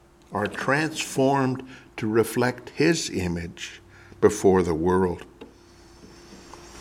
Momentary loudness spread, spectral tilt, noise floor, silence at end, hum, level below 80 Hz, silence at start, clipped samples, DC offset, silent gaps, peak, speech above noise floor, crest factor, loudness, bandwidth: 17 LU; -5 dB/octave; -51 dBFS; 0 s; none; -52 dBFS; 0.3 s; under 0.1%; under 0.1%; none; -4 dBFS; 27 dB; 20 dB; -24 LUFS; 16.5 kHz